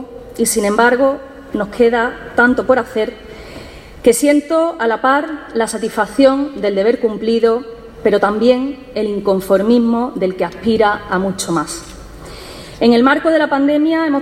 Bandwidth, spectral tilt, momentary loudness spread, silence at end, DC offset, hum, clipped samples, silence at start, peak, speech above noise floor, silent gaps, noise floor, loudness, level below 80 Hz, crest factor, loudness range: 16 kHz; -4.5 dB/octave; 19 LU; 0 s; under 0.1%; none; under 0.1%; 0 s; 0 dBFS; 20 dB; none; -34 dBFS; -15 LUFS; -44 dBFS; 14 dB; 2 LU